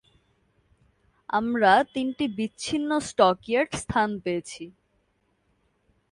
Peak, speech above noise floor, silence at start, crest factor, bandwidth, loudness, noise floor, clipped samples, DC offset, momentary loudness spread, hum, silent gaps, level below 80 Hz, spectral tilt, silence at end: -4 dBFS; 46 dB; 1.3 s; 22 dB; 11.5 kHz; -25 LUFS; -70 dBFS; under 0.1%; under 0.1%; 12 LU; none; none; -56 dBFS; -4.5 dB/octave; 1.4 s